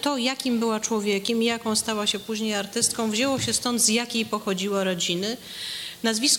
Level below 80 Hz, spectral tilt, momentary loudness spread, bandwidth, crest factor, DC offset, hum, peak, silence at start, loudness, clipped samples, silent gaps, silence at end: -62 dBFS; -2.5 dB/octave; 7 LU; 17 kHz; 18 dB; under 0.1%; none; -6 dBFS; 0 s; -24 LUFS; under 0.1%; none; 0 s